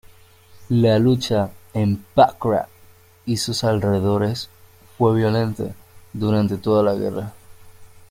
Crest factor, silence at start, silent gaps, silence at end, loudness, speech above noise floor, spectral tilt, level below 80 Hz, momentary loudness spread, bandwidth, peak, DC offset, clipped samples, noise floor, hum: 20 dB; 0.55 s; none; 0.25 s; -20 LUFS; 31 dB; -6.5 dB/octave; -52 dBFS; 14 LU; 16 kHz; -2 dBFS; under 0.1%; under 0.1%; -50 dBFS; none